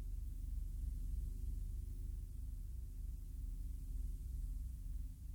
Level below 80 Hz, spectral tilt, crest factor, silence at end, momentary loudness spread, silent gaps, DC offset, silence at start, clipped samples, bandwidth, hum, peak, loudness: -44 dBFS; -7 dB/octave; 10 dB; 0 s; 4 LU; none; under 0.1%; 0 s; under 0.1%; 18 kHz; 60 Hz at -55 dBFS; -34 dBFS; -49 LUFS